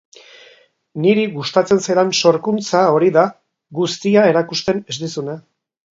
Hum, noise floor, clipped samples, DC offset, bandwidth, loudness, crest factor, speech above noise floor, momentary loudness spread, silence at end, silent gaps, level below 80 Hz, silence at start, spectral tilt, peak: none; -50 dBFS; under 0.1%; under 0.1%; 7.8 kHz; -16 LUFS; 16 dB; 35 dB; 12 LU; 0.5 s; none; -60 dBFS; 0.95 s; -5 dB/octave; 0 dBFS